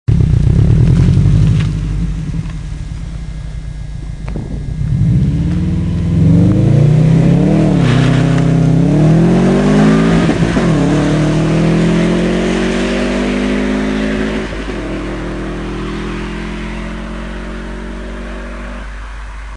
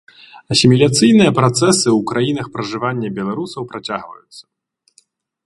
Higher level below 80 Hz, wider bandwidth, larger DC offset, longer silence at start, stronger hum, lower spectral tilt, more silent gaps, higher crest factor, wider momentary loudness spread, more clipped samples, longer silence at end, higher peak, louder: first, -22 dBFS vs -52 dBFS; about the same, 10.5 kHz vs 11.5 kHz; first, 0.4% vs under 0.1%; second, 0.1 s vs 0.35 s; neither; first, -7.5 dB/octave vs -5 dB/octave; neither; about the same, 12 dB vs 16 dB; about the same, 16 LU vs 15 LU; neither; second, 0 s vs 1.05 s; about the same, 0 dBFS vs 0 dBFS; about the same, -13 LUFS vs -15 LUFS